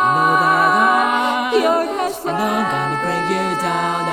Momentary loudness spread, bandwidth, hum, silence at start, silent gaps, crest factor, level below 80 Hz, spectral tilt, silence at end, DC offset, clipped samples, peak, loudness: 7 LU; 17.5 kHz; none; 0 s; none; 14 dB; -54 dBFS; -4.5 dB/octave; 0 s; under 0.1%; under 0.1%; -2 dBFS; -17 LUFS